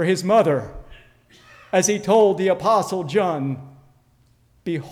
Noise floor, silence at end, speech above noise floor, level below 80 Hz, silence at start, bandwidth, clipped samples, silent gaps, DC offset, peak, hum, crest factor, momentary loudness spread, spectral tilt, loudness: -58 dBFS; 0 s; 40 dB; -52 dBFS; 0 s; 16 kHz; under 0.1%; none; under 0.1%; -6 dBFS; none; 16 dB; 12 LU; -5 dB/octave; -20 LUFS